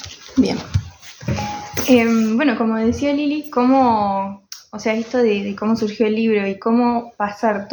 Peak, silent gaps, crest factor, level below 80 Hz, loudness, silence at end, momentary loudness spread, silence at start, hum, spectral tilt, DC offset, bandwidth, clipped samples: 0 dBFS; none; 18 dB; -46 dBFS; -18 LUFS; 0 s; 11 LU; 0 s; none; -5.5 dB/octave; under 0.1%; over 20 kHz; under 0.1%